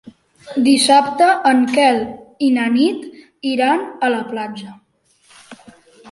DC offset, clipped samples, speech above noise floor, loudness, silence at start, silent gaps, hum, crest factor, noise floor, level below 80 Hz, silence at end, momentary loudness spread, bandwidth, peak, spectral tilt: under 0.1%; under 0.1%; 43 dB; -16 LUFS; 0.05 s; none; none; 16 dB; -58 dBFS; -62 dBFS; 0 s; 16 LU; 11.5 kHz; -2 dBFS; -3 dB/octave